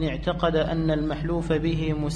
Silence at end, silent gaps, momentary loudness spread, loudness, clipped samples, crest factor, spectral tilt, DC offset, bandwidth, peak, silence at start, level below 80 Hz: 0 s; none; 3 LU; -25 LUFS; under 0.1%; 16 dB; -7.5 dB/octave; under 0.1%; 9.8 kHz; -10 dBFS; 0 s; -36 dBFS